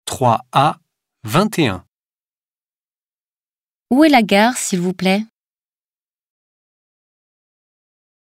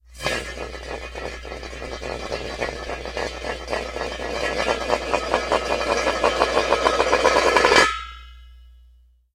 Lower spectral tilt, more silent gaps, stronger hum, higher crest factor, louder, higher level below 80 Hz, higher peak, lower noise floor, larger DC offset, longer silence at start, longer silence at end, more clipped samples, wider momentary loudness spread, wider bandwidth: first, -5 dB/octave vs -3 dB/octave; first, 1.88-3.86 s vs none; neither; second, 18 dB vs 24 dB; first, -16 LUFS vs -22 LUFS; second, -56 dBFS vs -40 dBFS; about the same, 0 dBFS vs 0 dBFS; first, under -90 dBFS vs -54 dBFS; neither; about the same, 0.05 s vs 0.1 s; first, 2.95 s vs 0.6 s; neither; about the same, 16 LU vs 16 LU; about the same, 16 kHz vs 16 kHz